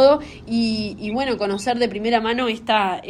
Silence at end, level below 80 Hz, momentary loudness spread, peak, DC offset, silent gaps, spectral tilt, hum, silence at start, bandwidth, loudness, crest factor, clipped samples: 0 s; -50 dBFS; 5 LU; -2 dBFS; under 0.1%; none; -5 dB/octave; none; 0 s; 12 kHz; -21 LUFS; 16 dB; under 0.1%